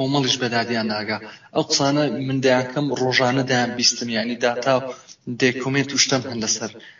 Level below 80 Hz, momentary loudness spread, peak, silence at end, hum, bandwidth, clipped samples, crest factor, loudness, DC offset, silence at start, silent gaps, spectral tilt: -62 dBFS; 8 LU; -4 dBFS; 0.1 s; none; 7.4 kHz; under 0.1%; 18 dB; -20 LUFS; under 0.1%; 0 s; none; -3 dB/octave